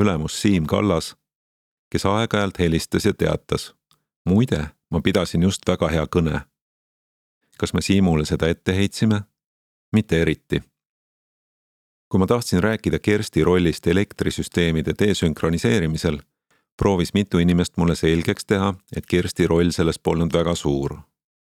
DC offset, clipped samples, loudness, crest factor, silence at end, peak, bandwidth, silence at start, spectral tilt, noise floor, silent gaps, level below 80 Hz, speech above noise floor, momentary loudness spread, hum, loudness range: under 0.1%; under 0.1%; -21 LUFS; 20 dB; 0.55 s; 0 dBFS; 15.5 kHz; 0 s; -6 dB/octave; under -90 dBFS; 1.35-1.91 s, 4.16-4.25 s, 6.62-7.41 s, 9.46-9.92 s, 10.89-12.11 s, 16.72-16.78 s; -40 dBFS; over 70 dB; 7 LU; none; 3 LU